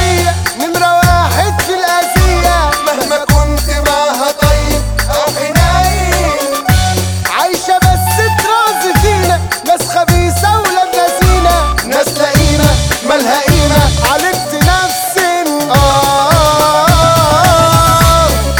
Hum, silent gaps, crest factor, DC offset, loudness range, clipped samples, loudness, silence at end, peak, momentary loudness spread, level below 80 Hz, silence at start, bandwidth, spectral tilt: none; none; 10 dB; under 0.1%; 3 LU; under 0.1%; -10 LUFS; 0 s; 0 dBFS; 5 LU; -18 dBFS; 0 s; over 20 kHz; -4 dB/octave